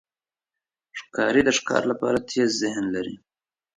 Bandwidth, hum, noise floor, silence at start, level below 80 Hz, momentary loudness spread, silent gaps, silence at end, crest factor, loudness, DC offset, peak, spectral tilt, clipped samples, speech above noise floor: 10.5 kHz; none; under -90 dBFS; 0.95 s; -58 dBFS; 17 LU; none; 0.6 s; 22 dB; -23 LUFS; under 0.1%; -4 dBFS; -3.5 dB/octave; under 0.1%; over 67 dB